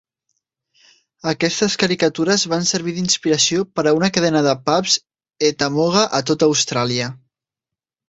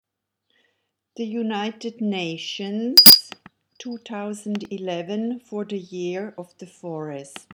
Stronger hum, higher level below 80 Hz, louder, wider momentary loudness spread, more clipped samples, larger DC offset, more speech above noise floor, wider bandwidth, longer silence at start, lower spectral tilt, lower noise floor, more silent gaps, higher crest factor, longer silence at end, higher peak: neither; about the same, -58 dBFS vs -56 dBFS; about the same, -17 LUFS vs -15 LUFS; second, 5 LU vs 26 LU; neither; neither; first, 69 dB vs 54 dB; second, 8.2 kHz vs 19.5 kHz; about the same, 1.25 s vs 1.2 s; first, -3.5 dB/octave vs -2 dB/octave; first, -87 dBFS vs -76 dBFS; neither; about the same, 18 dB vs 22 dB; first, 0.95 s vs 0.15 s; about the same, -2 dBFS vs 0 dBFS